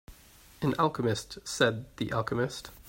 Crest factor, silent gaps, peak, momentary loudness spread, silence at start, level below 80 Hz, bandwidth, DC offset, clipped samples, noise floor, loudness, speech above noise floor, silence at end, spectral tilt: 22 dB; none; -8 dBFS; 7 LU; 0.1 s; -56 dBFS; 16.5 kHz; under 0.1%; under 0.1%; -56 dBFS; -30 LUFS; 25 dB; 0 s; -5 dB/octave